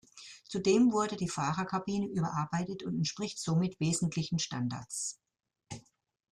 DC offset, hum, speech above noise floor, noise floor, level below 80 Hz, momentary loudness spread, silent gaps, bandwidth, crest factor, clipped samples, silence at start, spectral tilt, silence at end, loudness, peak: under 0.1%; none; 27 dB; -59 dBFS; -66 dBFS; 17 LU; none; 12.5 kHz; 18 dB; under 0.1%; 0.15 s; -5 dB/octave; 0.5 s; -32 LUFS; -16 dBFS